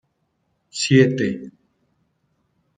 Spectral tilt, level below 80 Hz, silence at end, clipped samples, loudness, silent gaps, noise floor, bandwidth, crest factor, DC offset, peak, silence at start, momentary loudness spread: -5.5 dB/octave; -64 dBFS; 1.3 s; under 0.1%; -18 LUFS; none; -70 dBFS; 9.4 kHz; 20 dB; under 0.1%; -2 dBFS; 0.75 s; 18 LU